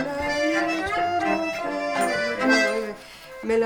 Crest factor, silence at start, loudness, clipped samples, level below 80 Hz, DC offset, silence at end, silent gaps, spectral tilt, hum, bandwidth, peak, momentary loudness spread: 18 dB; 0 s; -23 LUFS; under 0.1%; -52 dBFS; under 0.1%; 0 s; none; -3.5 dB/octave; none; 18.5 kHz; -6 dBFS; 13 LU